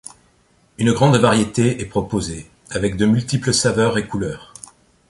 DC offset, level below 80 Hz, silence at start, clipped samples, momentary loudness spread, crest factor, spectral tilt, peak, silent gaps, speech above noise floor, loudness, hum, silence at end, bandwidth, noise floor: under 0.1%; -44 dBFS; 0.8 s; under 0.1%; 19 LU; 18 dB; -5 dB/octave; 0 dBFS; none; 40 dB; -18 LUFS; none; 0.65 s; 11.5 kHz; -57 dBFS